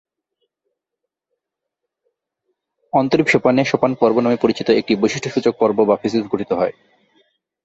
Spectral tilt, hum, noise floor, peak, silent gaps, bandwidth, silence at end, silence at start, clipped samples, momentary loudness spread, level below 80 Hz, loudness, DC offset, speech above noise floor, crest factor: -6 dB/octave; none; -81 dBFS; -2 dBFS; none; 8.2 kHz; 0.95 s; 2.95 s; under 0.1%; 6 LU; -58 dBFS; -17 LUFS; under 0.1%; 65 dB; 18 dB